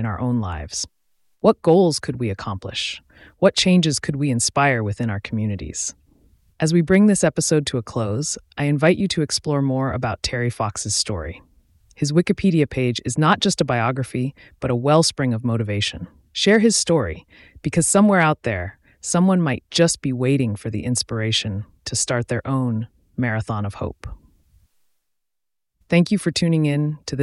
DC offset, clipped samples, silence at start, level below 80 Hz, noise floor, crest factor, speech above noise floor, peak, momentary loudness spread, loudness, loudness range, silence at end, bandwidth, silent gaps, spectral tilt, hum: under 0.1%; under 0.1%; 0 s; -46 dBFS; -85 dBFS; 18 dB; 65 dB; -2 dBFS; 12 LU; -20 LUFS; 5 LU; 0 s; 12 kHz; none; -4.5 dB/octave; none